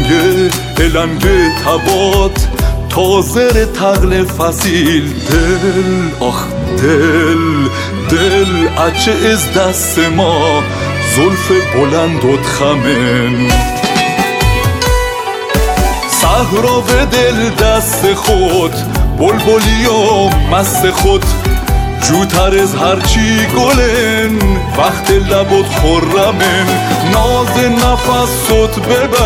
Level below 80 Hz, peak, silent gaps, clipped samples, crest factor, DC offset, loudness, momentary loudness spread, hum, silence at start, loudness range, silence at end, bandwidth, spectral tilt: -20 dBFS; 0 dBFS; none; under 0.1%; 10 dB; under 0.1%; -11 LUFS; 4 LU; none; 0 s; 1 LU; 0 s; 17.5 kHz; -4.5 dB/octave